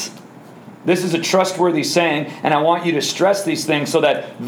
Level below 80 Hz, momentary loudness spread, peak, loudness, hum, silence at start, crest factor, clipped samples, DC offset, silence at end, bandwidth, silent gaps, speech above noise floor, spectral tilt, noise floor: -72 dBFS; 4 LU; -2 dBFS; -17 LUFS; none; 0 s; 16 dB; under 0.1%; under 0.1%; 0 s; over 20 kHz; none; 23 dB; -4 dB/octave; -40 dBFS